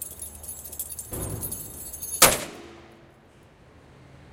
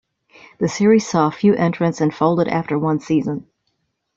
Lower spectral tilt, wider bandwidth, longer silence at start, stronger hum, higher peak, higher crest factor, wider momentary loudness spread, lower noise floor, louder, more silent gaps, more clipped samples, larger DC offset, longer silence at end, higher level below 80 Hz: second, -1.5 dB/octave vs -6.5 dB/octave; first, 17 kHz vs 7.8 kHz; second, 0 s vs 0.6 s; neither; first, 0 dBFS vs -4 dBFS; first, 30 dB vs 16 dB; first, 20 LU vs 8 LU; second, -54 dBFS vs -71 dBFS; second, -25 LUFS vs -18 LUFS; neither; neither; neither; second, 0 s vs 0.75 s; first, -48 dBFS vs -58 dBFS